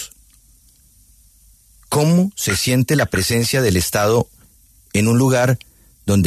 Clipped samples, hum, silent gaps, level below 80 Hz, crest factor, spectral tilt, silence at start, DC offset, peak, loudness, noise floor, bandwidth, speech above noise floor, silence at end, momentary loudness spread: under 0.1%; none; none; -44 dBFS; 14 dB; -5 dB/octave; 0 s; under 0.1%; -4 dBFS; -17 LUFS; -52 dBFS; 14 kHz; 36 dB; 0 s; 8 LU